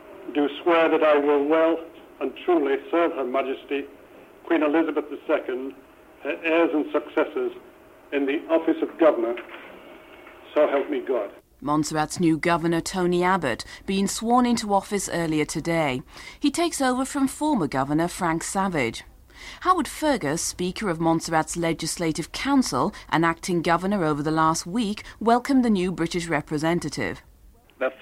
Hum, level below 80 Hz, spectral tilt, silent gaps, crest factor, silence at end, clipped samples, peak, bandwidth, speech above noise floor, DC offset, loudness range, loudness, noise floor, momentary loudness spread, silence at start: none; -52 dBFS; -5 dB/octave; none; 18 dB; 0.05 s; under 0.1%; -6 dBFS; 16 kHz; 29 dB; under 0.1%; 3 LU; -24 LUFS; -53 dBFS; 10 LU; 0 s